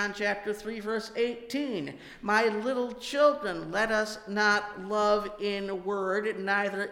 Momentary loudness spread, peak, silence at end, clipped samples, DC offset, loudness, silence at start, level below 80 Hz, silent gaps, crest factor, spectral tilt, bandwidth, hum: 8 LU; -12 dBFS; 0 s; under 0.1%; under 0.1%; -29 LUFS; 0 s; -60 dBFS; none; 18 dB; -4 dB/octave; 16.5 kHz; none